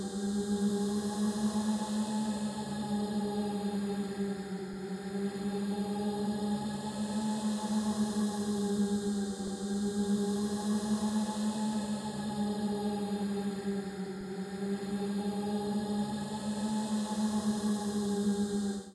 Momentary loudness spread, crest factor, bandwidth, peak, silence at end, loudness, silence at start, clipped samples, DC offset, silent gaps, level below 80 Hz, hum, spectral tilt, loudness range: 5 LU; 12 dB; 13 kHz; -22 dBFS; 0 s; -34 LUFS; 0 s; under 0.1%; under 0.1%; none; -64 dBFS; none; -5.5 dB/octave; 3 LU